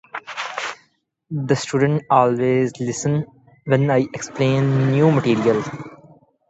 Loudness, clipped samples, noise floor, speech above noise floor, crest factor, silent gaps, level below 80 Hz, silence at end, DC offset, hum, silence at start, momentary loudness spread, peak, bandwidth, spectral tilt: -19 LUFS; under 0.1%; -63 dBFS; 45 dB; 18 dB; none; -58 dBFS; 0.55 s; under 0.1%; none; 0.15 s; 15 LU; 0 dBFS; 8.2 kHz; -6.5 dB/octave